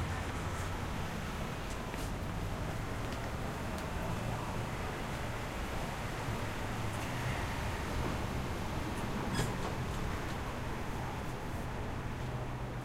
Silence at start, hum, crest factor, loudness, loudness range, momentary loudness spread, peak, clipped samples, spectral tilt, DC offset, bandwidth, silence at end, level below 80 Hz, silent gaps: 0 s; none; 18 dB; -39 LUFS; 2 LU; 3 LU; -20 dBFS; under 0.1%; -5.5 dB/octave; under 0.1%; 16 kHz; 0 s; -44 dBFS; none